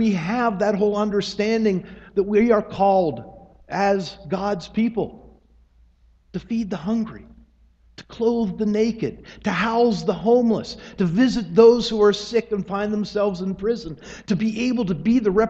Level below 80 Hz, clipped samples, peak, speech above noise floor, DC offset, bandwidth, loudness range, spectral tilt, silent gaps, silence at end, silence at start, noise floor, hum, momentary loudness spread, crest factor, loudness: -50 dBFS; under 0.1%; -2 dBFS; 35 dB; under 0.1%; 8 kHz; 9 LU; -6.5 dB/octave; none; 0 s; 0 s; -56 dBFS; none; 11 LU; 20 dB; -21 LUFS